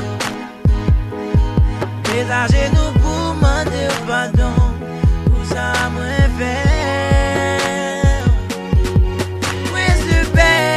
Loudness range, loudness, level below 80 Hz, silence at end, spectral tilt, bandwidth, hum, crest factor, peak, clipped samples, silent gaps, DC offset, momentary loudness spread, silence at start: 1 LU; -17 LUFS; -20 dBFS; 0 s; -5.5 dB/octave; 14 kHz; none; 14 dB; 0 dBFS; under 0.1%; none; under 0.1%; 5 LU; 0 s